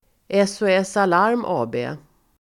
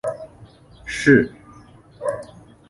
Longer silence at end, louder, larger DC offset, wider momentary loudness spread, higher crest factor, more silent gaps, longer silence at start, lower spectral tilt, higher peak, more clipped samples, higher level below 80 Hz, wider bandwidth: about the same, 0.45 s vs 0.45 s; about the same, -20 LUFS vs -20 LUFS; neither; second, 11 LU vs 25 LU; second, 16 dB vs 22 dB; neither; first, 0.3 s vs 0.05 s; about the same, -5 dB/octave vs -6 dB/octave; about the same, -4 dBFS vs -2 dBFS; neither; second, -62 dBFS vs -50 dBFS; about the same, 12.5 kHz vs 11.5 kHz